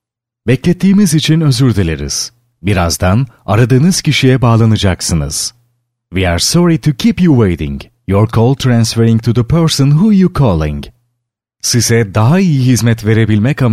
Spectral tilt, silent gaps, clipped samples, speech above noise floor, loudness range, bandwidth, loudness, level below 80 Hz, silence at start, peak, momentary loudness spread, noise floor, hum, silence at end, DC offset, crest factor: -5.5 dB/octave; none; under 0.1%; 62 dB; 1 LU; 15.5 kHz; -11 LUFS; -32 dBFS; 0.45 s; 0 dBFS; 8 LU; -72 dBFS; none; 0 s; under 0.1%; 10 dB